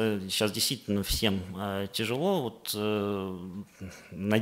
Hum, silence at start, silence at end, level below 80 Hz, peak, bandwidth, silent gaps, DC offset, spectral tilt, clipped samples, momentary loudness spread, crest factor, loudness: none; 0 s; 0 s; -48 dBFS; -8 dBFS; 16 kHz; none; under 0.1%; -4 dB/octave; under 0.1%; 15 LU; 22 dB; -30 LUFS